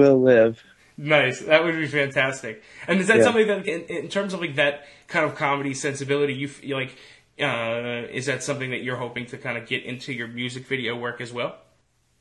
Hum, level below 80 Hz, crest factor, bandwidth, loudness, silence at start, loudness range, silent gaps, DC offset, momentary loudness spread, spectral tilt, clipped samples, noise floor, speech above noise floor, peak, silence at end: none; -66 dBFS; 20 dB; 12 kHz; -23 LUFS; 0 s; 8 LU; none; under 0.1%; 13 LU; -5 dB/octave; under 0.1%; -65 dBFS; 42 dB; -4 dBFS; 0.65 s